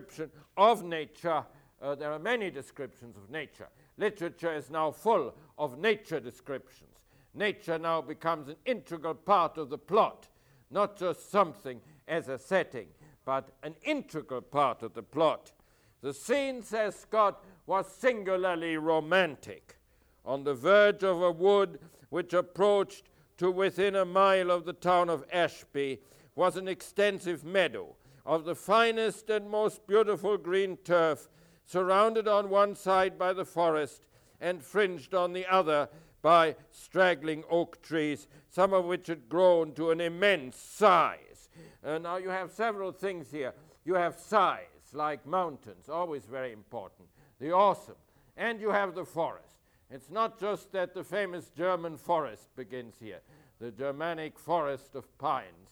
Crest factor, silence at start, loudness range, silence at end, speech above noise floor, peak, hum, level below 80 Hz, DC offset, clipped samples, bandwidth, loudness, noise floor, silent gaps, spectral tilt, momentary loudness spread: 22 dB; 0 s; 7 LU; 0.2 s; 36 dB; -10 dBFS; none; -70 dBFS; under 0.1%; under 0.1%; 19 kHz; -30 LUFS; -66 dBFS; none; -5 dB/octave; 16 LU